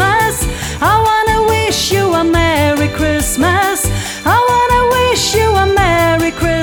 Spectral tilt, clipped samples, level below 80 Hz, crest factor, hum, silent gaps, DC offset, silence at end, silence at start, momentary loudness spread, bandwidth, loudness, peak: -4 dB/octave; under 0.1%; -26 dBFS; 12 dB; none; none; under 0.1%; 0 s; 0 s; 4 LU; over 20 kHz; -12 LUFS; 0 dBFS